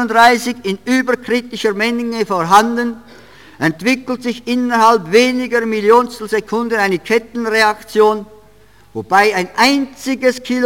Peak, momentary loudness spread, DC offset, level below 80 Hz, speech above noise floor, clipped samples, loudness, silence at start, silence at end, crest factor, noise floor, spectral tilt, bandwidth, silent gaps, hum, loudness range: 0 dBFS; 9 LU; 0.4%; -54 dBFS; 33 dB; under 0.1%; -14 LUFS; 0 s; 0 s; 14 dB; -47 dBFS; -4 dB/octave; 17 kHz; none; none; 2 LU